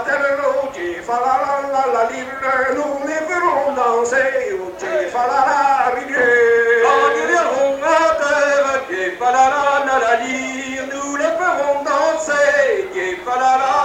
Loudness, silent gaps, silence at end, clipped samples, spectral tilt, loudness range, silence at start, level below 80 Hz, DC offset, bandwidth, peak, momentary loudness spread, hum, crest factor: -17 LUFS; none; 0 s; under 0.1%; -2.5 dB/octave; 4 LU; 0 s; -54 dBFS; under 0.1%; 16 kHz; -2 dBFS; 9 LU; none; 14 dB